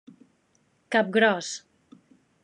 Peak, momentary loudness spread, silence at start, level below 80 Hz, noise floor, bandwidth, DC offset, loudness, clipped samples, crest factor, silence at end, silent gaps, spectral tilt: -8 dBFS; 15 LU; 0.9 s; -86 dBFS; -67 dBFS; 10.5 kHz; under 0.1%; -24 LUFS; under 0.1%; 20 dB; 0.85 s; none; -3.5 dB/octave